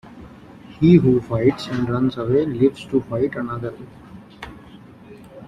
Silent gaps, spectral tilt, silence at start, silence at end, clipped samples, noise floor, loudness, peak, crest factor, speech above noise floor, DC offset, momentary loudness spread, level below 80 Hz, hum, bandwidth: none; -8.5 dB/octave; 0.05 s; 0 s; under 0.1%; -43 dBFS; -19 LUFS; -2 dBFS; 18 dB; 25 dB; under 0.1%; 24 LU; -48 dBFS; none; 9.2 kHz